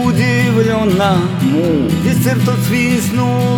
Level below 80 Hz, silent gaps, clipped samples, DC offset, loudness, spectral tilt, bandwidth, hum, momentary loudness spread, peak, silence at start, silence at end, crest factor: -44 dBFS; none; under 0.1%; under 0.1%; -13 LUFS; -6 dB/octave; 20 kHz; none; 2 LU; 0 dBFS; 0 s; 0 s; 12 dB